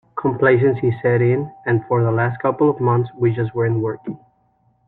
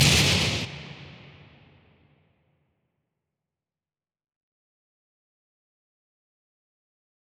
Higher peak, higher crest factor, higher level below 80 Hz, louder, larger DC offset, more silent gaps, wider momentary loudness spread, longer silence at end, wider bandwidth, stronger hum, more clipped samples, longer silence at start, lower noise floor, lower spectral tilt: first, -2 dBFS vs -6 dBFS; second, 16 dB vs 26 dB; second, -56 dBFS vs -48 dBFS; first, -18 LUFS vs -22 LUFS; neither; neither; second, 7 LU vs 26 LU; second, 0.7 s vs 6.3 s; second, 4 kHz vs over 20 kHz; neither; neither; first, 0.15 s vs 0 s; second, -61 dBFS vs under -90 dBFS; first, -12 dB/octave vs -3 dB/octave